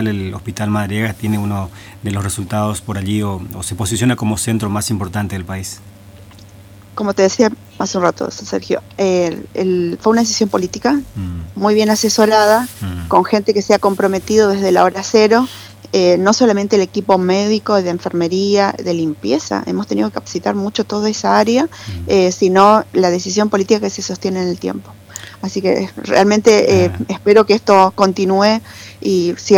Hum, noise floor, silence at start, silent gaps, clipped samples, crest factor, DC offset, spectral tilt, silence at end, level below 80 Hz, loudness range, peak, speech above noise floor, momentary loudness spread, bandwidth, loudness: none; -39 dBFS; 0 s; none; under 0.1%; 14 dB; under 0.1%; -5 dB/octave; 0 s; -46 dBFS; 7 LU; 0 dBFS; 25 dB; 13 LU; 18.5 kHz; -15 LUFS